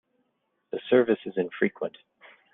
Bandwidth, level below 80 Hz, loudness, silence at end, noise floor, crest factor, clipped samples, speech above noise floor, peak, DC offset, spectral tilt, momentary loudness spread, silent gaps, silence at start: 3.9 kHz; -74 dBFS; -27 LUFS; 0.65 s; -76 dBFS; 20 dB; under 0.1%; 50 dB; -8 dBFS; under 0.1%; -4.5 dB/octave; 14 LU; none; 0.75 s